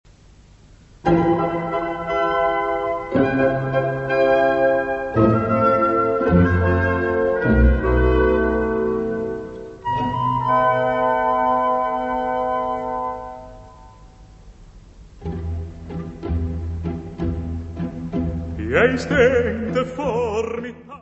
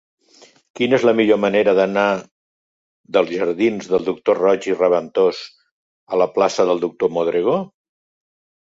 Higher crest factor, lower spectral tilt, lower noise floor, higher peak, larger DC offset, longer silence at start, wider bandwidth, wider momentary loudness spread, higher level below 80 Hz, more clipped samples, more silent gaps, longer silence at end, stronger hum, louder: about the same, 18 dB vs 16 dB; first, -8 dB/octave vs -5.5 dB/octave; about the same, -48 dBFS vs -51 dBFS; about the same, -2 dBFS vs -2 dBFS; neither; first, 1.05 s vs 0.75 s; about the same, 8.2 kHz vs 7.8 kHz; first, 13 LU vs 7 LU; first, -32 dBFS vs -62 dBFS; neither; second, none vs 2.31-3.04 s, 5.71-6.07 s; second, 0.05 s vs 1 s; neither; about the same, -20 LUFS vs -18 LUFS